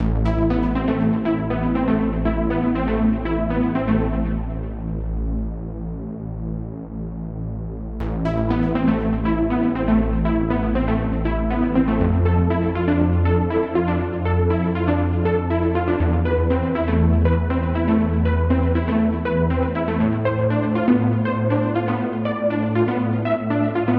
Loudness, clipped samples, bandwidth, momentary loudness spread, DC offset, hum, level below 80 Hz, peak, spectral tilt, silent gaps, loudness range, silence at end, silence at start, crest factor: -21 LUFS; under 0.1%; 4.7 kHz; 10 LU; under 0.1%; none; -28 dBFS; -4 dBFS; -11 dB/octave; none; 6 LU; 0 s; 0 s; 16 dB